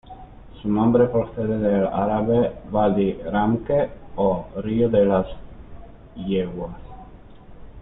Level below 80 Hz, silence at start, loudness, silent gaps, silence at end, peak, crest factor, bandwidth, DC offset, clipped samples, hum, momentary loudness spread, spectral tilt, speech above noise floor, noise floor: -42 dBFS; 0.1 s; -22 LUFS; none; 0 s; -6 dBFS; 16 dB; 4 kHz; under 0.1%; under 0.1%; none; 14 LU; -12 dB/octave; 22 dB; -43 dBFS